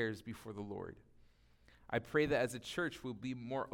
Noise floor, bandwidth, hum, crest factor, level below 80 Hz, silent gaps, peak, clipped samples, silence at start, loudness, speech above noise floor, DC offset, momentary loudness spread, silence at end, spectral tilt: -67 dBFS; 17.5 kHz; none; 20 dB; -64 dBFS; none; -20 dBFS; under 0.1%; 0 s; -40 LUFS; 27 dB; under 0.1%; 13 LU; 0 s; -5.5 dB/octave